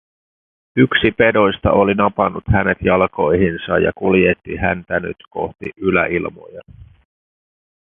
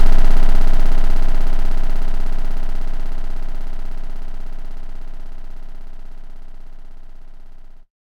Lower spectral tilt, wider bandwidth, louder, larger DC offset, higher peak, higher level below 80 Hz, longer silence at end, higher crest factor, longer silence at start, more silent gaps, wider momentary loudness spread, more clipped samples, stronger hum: first, -10 dB/octave vs -6.5 dB/octave; first, 4 kHz vs 3.3 kHz; first, -16 LUFS vs -26 LUFS; neither; about the same, 0 dBFS vs 0 dBFS; second, -36 dBFS vs -16 dBFS; first, 1 s vs 0.5 s; first, 18 dB vs 12 dB; first, 0.75 s vs 0 s; neither; second, 11 LU vs 24 LU; neither; neither